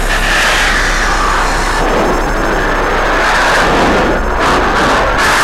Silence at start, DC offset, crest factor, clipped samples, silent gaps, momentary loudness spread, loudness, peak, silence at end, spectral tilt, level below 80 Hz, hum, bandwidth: 0 s; under 0.1%; 8 dB; under 0.1%; none; 4 LU; -11 LUFS; -2 dBFS; 0 s; -3.5 dB/octave; -18 dBFS; none; 15.5 kHz